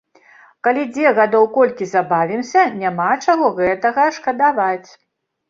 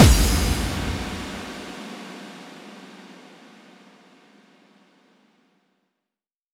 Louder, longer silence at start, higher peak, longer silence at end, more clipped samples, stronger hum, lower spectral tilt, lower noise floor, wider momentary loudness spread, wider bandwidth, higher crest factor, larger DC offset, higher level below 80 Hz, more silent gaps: first, -16 LUFS vs -25 LUFS; first, 0.65 s vs 0 s; about the same, -2 dBFS vs 0 dBFS; second, 0.7 s vs 3.4 s; neither; neither; about the same, -5.5 dB/octave vs -4.5 dB/octave; second, -48 dBFS vs -89 dBFS; second, 6 LU vs 25 LU; second, 7.6 kHz vs 18.5 kHz; second, 16 dB vs 26 dB; neither; second, -62 dBFS vs -30 dBFS; neither